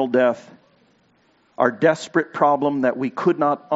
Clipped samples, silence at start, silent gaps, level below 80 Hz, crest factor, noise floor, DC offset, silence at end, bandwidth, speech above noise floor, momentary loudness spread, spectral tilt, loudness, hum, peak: under 0.1%; 0 s; none; -72 dBFS; 18 dB; -60 dBFS; under 0.1%; 0 s; 8 kHz; 41 dB; 4 LU; -5 dB/octave; -20 LUFS; none; -2 dBFS